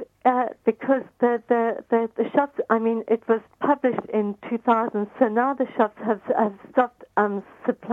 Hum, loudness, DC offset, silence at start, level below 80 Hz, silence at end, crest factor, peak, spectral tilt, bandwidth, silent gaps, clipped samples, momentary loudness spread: none; -23 LUFS; under 0.1%; 0 s; -70 dBFS; 0 s; 18 dB; -6 dBFS; -8.5 dB/octave; 4 kHz; none; under 0.1%; 5 LU